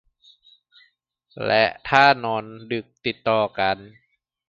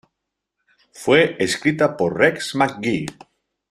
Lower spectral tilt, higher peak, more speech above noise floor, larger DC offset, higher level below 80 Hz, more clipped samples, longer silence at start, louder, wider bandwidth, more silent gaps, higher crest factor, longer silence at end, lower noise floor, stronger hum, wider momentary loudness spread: about the same, -5.5 dB/octave vs -4.5 dB/octave; about the same, 0 dBFS vs -2 dBFS; second, 43 dB vs 61 dB; neither; about the same, -60 dBFS vs -58 dBFS; neither; first, 1.35 s vs 0.95 s; about the same, -21 LUFS vs -19 LUFS; second, 7.4 kHz vs 14 kHz; neither; about the same, 24 dB vs 20 dB; about the same, 0.6 s vs 0.6 s; second, -64 dBFS vs -80 dBFS; neither; first, 14 LU vs 9 LU